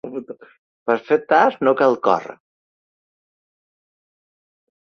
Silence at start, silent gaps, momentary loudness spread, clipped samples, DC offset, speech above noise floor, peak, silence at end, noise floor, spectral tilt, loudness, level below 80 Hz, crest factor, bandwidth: 0.05 s; 0.59-0.86 s; 18 LU; under 0.1%; under 0.1%; over 72 dB; 0 dBFS; 2.55 s; under -90 dBFS; -6 dB/octave; -18 LUFS; -70 dBFS; 22 dB; 6.8 kHz